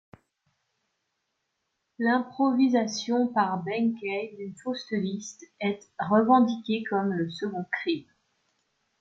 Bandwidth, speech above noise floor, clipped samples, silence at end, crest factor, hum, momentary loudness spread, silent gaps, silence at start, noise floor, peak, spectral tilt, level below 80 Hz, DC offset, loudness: 7.8 kHz; 53 dB; under 0.1%; 1 s; 20 dB; none; 12 LU; none; 2 s; -79 dBFS; -8 dBFS; -5.5 dB/octave; -74 dBFS; under 0.1%; -27 LUFS